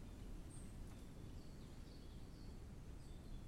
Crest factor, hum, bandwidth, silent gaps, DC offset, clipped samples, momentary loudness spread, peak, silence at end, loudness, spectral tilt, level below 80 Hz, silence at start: 12 dB; none; 16 kHz; none; under 0.1%; under 0.1%; 2 LU; -42 dBFS; 0 s; -57 LUFS; -6 dB/octave; -56 dBFS; 0 s